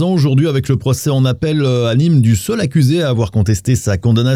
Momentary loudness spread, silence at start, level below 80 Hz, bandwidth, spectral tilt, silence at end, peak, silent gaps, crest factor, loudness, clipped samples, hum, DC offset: 3 LU; 0 s; -42 dBFS; 15.5 kHz; -6.5 dB/octave; 0 s; -2 dBFS; none; 10 dB; -14 LUFS; under 0.1%; none; under 0.1%